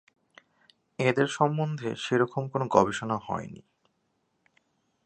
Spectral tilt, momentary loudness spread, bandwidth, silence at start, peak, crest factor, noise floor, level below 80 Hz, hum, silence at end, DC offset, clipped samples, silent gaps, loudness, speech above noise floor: -6 dB/octave; 11 LU; 9.2 kHz; 1 s; -6 dBFS; 24 dB; -75 dBFS; -64 dBFS; none; 1.45 s; under 0.1%; under 0.1%; none; -27 LUFS; 48 dB